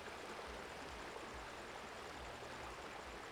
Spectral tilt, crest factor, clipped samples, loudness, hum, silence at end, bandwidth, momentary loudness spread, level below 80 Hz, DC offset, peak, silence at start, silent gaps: -3.5 dB/octave; 14 dB; under 0.1%; -50 LUFS; none; 0 s; over 20 kHz; 1 LU; -64 dBFS; under 0.1%; -38 dBFS; 0 s; none